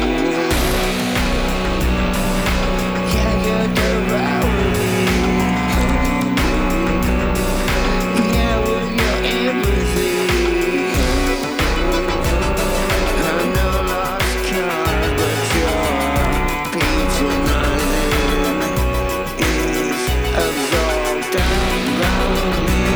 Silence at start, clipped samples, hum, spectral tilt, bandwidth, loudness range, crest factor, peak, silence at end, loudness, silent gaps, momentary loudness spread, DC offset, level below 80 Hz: 0 s; under 0.1%; none; -5 dB/octave; over 20 kHz; 1 LU; 12 dB; -4 dBFS; 0 s; -18 LUFS; none; 2 LU; under 0.1%; -22 dBFS